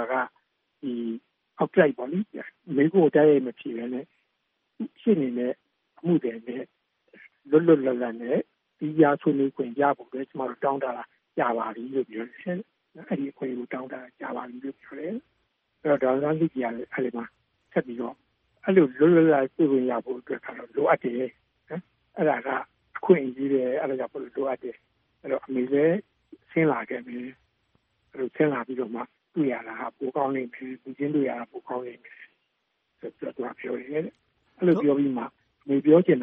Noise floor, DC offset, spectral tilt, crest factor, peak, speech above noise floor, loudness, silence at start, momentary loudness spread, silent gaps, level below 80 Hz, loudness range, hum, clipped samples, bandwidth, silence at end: -76 dBFS; under 0.1%; -7 dB/octave; 22 dB; -4 dBFS; 51 dB; -26 LUFS; 0 s; 17 LU; none; -74 dBFS; 8 LU; none; under 0.1%; 3.8 kHz; 0 s